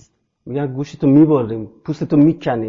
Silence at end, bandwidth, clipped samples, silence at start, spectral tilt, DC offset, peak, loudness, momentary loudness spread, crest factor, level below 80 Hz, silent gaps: 0 s; 7 kHz; under 0.1%; 0.45 s; -9.5 dB/octave; under 0.1%; -2 dBFS; -16 LUFS; 15 LU; 14 dB; -54 dBFS; none